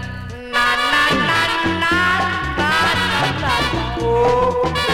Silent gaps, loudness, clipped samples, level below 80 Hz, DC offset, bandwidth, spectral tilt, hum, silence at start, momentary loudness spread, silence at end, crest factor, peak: none; -16 LUFS; under 0.1%; -34 dBFS; under 0.1%; 17.5 kHz; -4 dB/octave; none; 0 s; 5 LU; 0 s; 14 dB; -4 dBFS